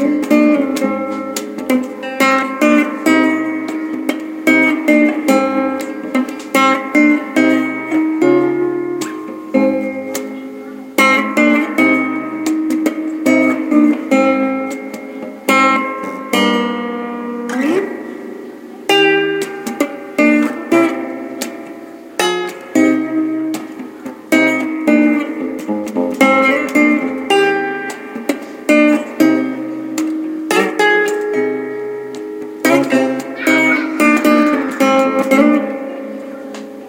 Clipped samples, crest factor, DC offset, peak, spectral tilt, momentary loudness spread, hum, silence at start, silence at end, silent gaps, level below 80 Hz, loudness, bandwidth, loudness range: under 0.1%; 14 dB; under 0.1%; 0 dBFS; -4 dB/octave; 13 LU; none; 0 s; 0 s; none; -66 dBFS; -15 LUFS; 17 kHz; 4 LU